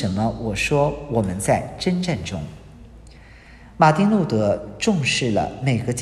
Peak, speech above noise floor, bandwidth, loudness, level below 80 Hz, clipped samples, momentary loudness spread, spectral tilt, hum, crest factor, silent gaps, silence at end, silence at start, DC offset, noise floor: -2 dBFS; 24 dB; 13 kHz; -21 LUFS; -44 dBFS; under 0.1%; 7 LU; -5.5 dB/octave; none; 20 dB; none; 0 s; 0 s; under 0.1%; -44 dBFS